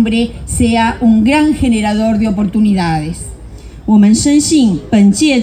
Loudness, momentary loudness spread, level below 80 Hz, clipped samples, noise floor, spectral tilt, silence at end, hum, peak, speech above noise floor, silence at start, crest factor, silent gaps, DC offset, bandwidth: -11 LUFS; 9 LU; -30 dBFS; under 0.1%; -30 dBFS; -5 dB/octave; 0 s; none; 0 dBFS; 20 dB; 0 s; 10 dB; none; under 0.1%; 15 kHz